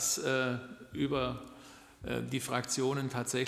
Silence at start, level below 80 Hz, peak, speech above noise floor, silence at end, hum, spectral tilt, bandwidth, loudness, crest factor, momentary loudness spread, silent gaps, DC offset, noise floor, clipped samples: 0 s; -60 dBFS; -16 dBFS; 20 dB; 0 s; none; -3.5 dB/octave; 15 kHz; -34 LUFS; 20 dB; 16 LU; none; under 0.1%; -54 dBFS; under 0.1%